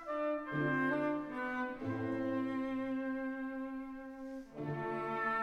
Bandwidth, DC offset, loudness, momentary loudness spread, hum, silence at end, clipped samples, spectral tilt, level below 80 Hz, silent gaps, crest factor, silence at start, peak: 6.8 kHz; under 0.1%; -38 LUFS; 11 LU; none; 0 s; under 0.1%; -8 dB/octave; -66 dBFS; none; 14 dB; 0 s; -24 dBFS